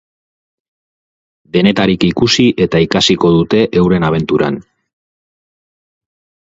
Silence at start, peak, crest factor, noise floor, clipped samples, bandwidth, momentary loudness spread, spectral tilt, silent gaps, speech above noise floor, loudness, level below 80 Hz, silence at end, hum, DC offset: 1.55 s; 0 dBFS; 14 dB; under -90 dBFS; under 0.1%; 7.8 kHz; 5 LU; -5.5 dB/octave; none; over 79 dB; -12 LUFS; -42 dBFS; 1.85 s; none; under 0.1%